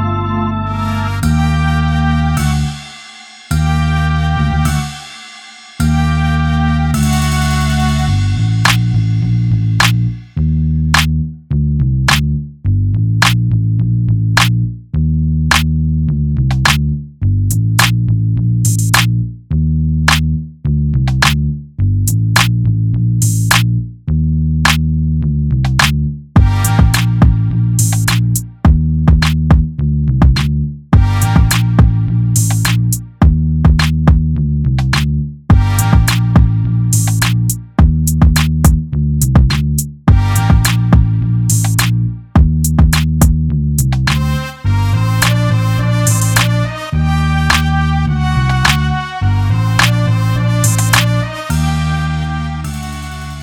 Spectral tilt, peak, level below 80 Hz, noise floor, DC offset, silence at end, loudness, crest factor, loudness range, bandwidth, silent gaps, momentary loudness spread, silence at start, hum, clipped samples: -5 dB/octave; 0 dBFS; -20 dBFS; -35 dBFS; under 0.1%; 0 s; -13 LUFS; 12 dB; 3 LU; 18 kHz; none; 6 LU; 0 s; none; under 0.1%